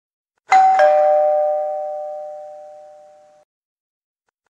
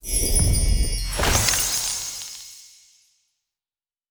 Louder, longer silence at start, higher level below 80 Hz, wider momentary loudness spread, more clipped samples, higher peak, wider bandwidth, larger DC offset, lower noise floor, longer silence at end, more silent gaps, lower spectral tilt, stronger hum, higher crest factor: first, -15 LUFS vs -21 LUFS; first, 0.5 s vs 0.05 s; second, -84 dBFS vs -28 dBFS; first, 20 LU vs 15 LU; neither; about the same, -2 dBFS vs -4 dBFS; second, 8.2 kHz vs over 20 kHz; neither; second, -47 dBFS vs under -90 dBFS; first, 1.7 s vs 1.45 s; neither; about the same, -1.5 dB/octave vs -2.5 dB/octave; neither; about the same, 18 dB vs 20 dB